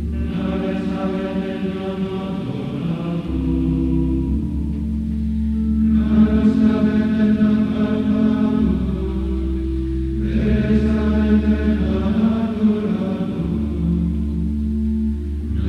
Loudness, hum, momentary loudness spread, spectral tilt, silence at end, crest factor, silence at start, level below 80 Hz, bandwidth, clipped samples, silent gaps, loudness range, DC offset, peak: -20 LUFS; none; 8 LU; -9.5 dB/octave; 0 s; 14 dB; 0 s; -26 dBFS; 5.8 kHz; under 0.1%; none; 5 LU; under 0.1%; -4 dBFS